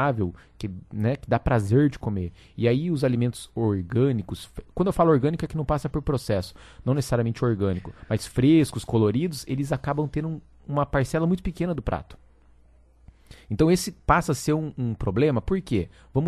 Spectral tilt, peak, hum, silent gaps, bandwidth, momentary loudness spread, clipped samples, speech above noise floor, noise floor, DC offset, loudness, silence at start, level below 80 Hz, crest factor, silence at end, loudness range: -7 dB/octave; -6 dBFS; none; none; 13 kHz; 11 LU; under 0.1%; 31 dB; -55 dBFS; under 0.1%; -25 LUFS; 0 s; -42 dBFS; 20 dB; 0 s; 3 LU